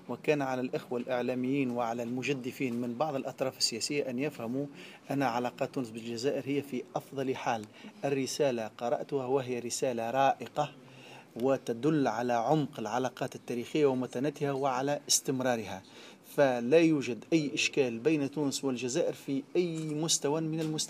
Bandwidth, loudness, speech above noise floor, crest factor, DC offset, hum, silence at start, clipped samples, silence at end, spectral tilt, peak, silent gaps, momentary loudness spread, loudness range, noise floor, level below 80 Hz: 15.5 kHz; -31 LUFS; 20 dB; 20 dB; under 0.1%; none; 0 s; under 0.1%; 0 s; -4 dB/octave; -12 dBFS; none; 9 LU; 5 LU; -52 dBFS; -80 dBFS